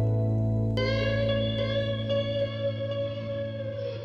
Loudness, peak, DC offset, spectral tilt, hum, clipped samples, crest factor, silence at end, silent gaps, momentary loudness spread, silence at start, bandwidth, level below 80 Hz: -28 LUFS; -16 dBFS; under 0.1%; -8 dB/octave; none; under 0.1%; 12 dB; 0 s; none; 7 LU; 0 s; 6.6 kHz; -44 dBFS